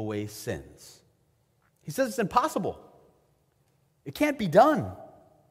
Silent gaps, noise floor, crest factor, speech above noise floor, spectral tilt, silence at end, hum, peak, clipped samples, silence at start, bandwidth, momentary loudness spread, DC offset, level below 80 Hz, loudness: none; -69 dBFS; 22 dB; 42 dB; -5.5 dB/octave; 0.45 s; none; -6 dBFS; under 0.1%; 0 s; 16 kHz; 26 LU; under 0.1%; -60 dBFS; -27 LUFS